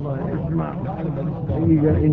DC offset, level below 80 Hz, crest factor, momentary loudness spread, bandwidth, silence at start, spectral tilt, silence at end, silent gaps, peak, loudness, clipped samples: under 0.1%; -36 dBFS; 14 dB; 9 LU; 3.9 kHz; 0 s; -11 dB/octave; 0 s; none; -6 dBFS; -22 LUFS; under 0.1%